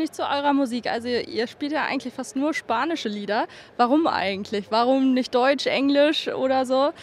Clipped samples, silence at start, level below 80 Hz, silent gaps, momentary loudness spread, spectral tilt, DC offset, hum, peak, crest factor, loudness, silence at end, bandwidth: under 0.1%; 0 s; -70 dBFS; none; 7 LU; -4 dB/octave; under 0.1%; none; -6 dBFS; 18 dB; -23 LUFS; 0 s; 12.5 kHz